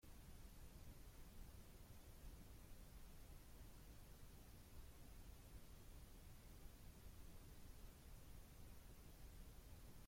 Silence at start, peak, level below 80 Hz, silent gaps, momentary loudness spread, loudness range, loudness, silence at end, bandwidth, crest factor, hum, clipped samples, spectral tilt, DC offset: 0 s; -46 dBFS; -62 dBFS; none; 1 LU; 0 LU; -64 LUFS; 0 s; 16.5 kHz; 14 dB; none; under 0.1%; -4.5 dB/octave; under 0.1%